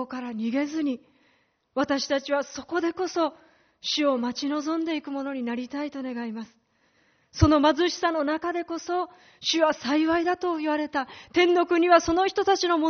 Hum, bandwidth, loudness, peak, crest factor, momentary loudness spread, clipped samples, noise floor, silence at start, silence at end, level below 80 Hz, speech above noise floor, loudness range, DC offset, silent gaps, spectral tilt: none; 6.6 kHz; -25 LUFS; -4 dBFS; 22 dB; 12 LU; under 0.1%; -67 dBFS; 0 s; 0 s; -48 dBFS; 42 dB; 6 LU; under 0.1%; none; -3.5 dB/octave